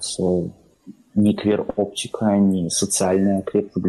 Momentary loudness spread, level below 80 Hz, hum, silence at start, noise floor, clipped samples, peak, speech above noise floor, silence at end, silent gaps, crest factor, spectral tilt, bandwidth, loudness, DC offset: 7 LU; -54 dBFS; none; 0 s; -46 dBFS; under 0.1%; -8 dBFS; 26 dB; 0 s; none; 12 dB; -5 dB/octave; 12.5 kHz; -20 LUFS; under 0.1%